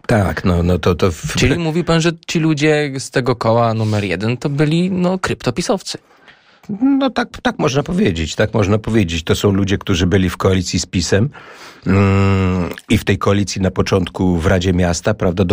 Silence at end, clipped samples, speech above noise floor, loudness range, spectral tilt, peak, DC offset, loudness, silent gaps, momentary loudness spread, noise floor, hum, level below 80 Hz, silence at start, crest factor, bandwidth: 0 s; under 0.1%; 31 dB; 3 LU; -6 dB/octave; -2 dBFS; under 0.1%; -16 LUFS; none; 5 LU; -46 dBFS; none; -36 dBFS; 0.1 s; 14 dB; 16 kHz